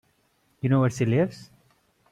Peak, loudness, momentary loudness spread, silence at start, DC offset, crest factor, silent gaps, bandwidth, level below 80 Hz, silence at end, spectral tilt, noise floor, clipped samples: -12 dBFS; -24 LUFS; 9 LU; 0.65 s; under 0.1%; 16 dB; none; 11 kHz; -62 dBFS; 0.7 s; -7.5 dB/octave; -67 dBFS; under 0.1%